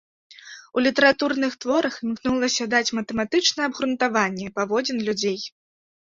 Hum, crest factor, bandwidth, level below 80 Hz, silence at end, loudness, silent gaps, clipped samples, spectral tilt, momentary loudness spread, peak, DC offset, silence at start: none; 20 dB; 7.8 kHz; -60 dBFS; 0.65 s; -22 LUFS; none; under 0.1%; -3 dB/octave; 9 LU; -4 dBFS; under 0.1%; 0.3 s